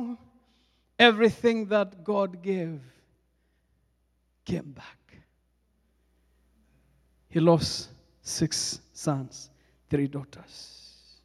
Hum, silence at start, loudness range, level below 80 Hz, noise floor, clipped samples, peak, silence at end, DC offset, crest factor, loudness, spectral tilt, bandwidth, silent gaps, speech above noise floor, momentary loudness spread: none; 0 s; 17 LU; -60 dBFS; -71 dBFS; under 0.1%; -4 dBFS; 0.6 s; under 0.1%; 26 dB; -26 LUFS; -4.5 dB/octave; 13.5 kHz; none; 45 dB; 25 LU